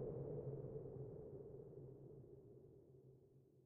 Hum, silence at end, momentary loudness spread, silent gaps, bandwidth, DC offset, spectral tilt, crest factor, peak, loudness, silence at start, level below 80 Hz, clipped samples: none; 0 s; 17 LU; none; 2.2 kHz; under 0.1%; -12 dB/octave; 16 dB; -38 dBFS; -54 LUFS; 0 s; -72 dBFS; under 0.1%